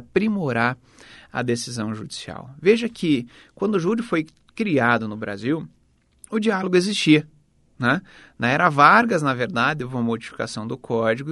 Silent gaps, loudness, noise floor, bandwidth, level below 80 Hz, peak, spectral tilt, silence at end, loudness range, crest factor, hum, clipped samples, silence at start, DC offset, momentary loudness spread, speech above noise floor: none; -21 LUFS; -52 dBFS; 11.5 kHz; -58 dBFS; 0 dBFS; -5.5 dB/octave; 0 s; 5 LU; 22 dB; none; under 0.1%; 0 s; under 0.1%; 12 LU; 31 dB